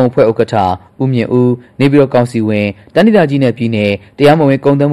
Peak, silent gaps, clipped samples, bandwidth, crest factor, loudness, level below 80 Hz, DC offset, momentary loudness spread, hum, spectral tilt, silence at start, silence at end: 0 dBFS; none; under 0.1%; 13 kHz; 10 dB; -11 LUFS; -46 dBFS; 0.4%; 6 LU; none; -8 dB/octave; 0 s; 0 s